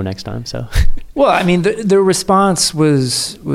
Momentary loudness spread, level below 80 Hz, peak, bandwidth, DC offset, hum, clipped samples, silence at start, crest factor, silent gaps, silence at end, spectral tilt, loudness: 11 LU; -24 dBFS; -2 dBFS; 15.5 kHz; under 0.1%; none; under 0.1%; 0 s; 12 dB; none; 0 s; -4.5 dB/octave; -14 LUFS